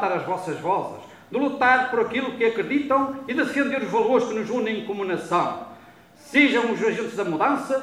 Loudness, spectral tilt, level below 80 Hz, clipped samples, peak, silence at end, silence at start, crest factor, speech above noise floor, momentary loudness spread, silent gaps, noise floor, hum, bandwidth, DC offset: -23 LUFS; -5 dB/octave; -66 dBFS; under 0.1%; -4 dBFS; 0 s; 0 s; 18 dB; 26 dB; 9 LU; none; -49 dBFS; none; 14 kHz; under 0.1%